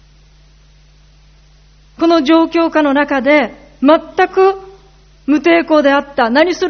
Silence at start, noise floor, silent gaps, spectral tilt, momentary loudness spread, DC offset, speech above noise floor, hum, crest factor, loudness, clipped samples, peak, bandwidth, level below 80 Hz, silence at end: 2 s; -45 dBFS; none; -1.5 dB/octave; 6 LU; under 0.1%; 34 dB; none; 14 dB; -12 LUFS; under 0.1%; 0 dBFS; 6.6 kHz; -46 dBFS; 0 s